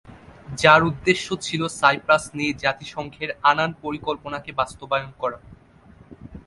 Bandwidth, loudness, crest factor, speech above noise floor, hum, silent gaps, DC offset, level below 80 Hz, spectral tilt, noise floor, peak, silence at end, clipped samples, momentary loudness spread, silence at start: 11.5 kHz; -21 LUFS; 22 dB; 28 dB; none; none; under 0.1%; -52 dBFS; -4 dB/octave; -50 dBFS; 0 dBFS; 0.05 s; under 0.1%; 14 LU; 0.1 s